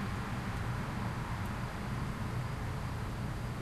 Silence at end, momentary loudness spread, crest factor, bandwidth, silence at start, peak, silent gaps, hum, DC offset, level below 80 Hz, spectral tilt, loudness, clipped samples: 0 s; 2 LU; 12 dB; 13 kHz; 0 s; -26 dBFS; none; none; under 0.1%; -46 dBFS; -6.5 dB/octave; -38 LUFS; under 0.1%